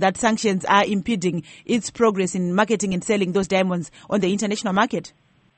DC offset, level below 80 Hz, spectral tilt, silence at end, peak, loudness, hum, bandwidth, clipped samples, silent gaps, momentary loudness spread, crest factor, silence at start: under 0.1%; -56 dBFS; -5 dB/octave; 0.5 s; -2 dBFS; -21 LUFS; none; 8.8 kHz; under 0.1%; none; 7 LU; 20 dB; 0 s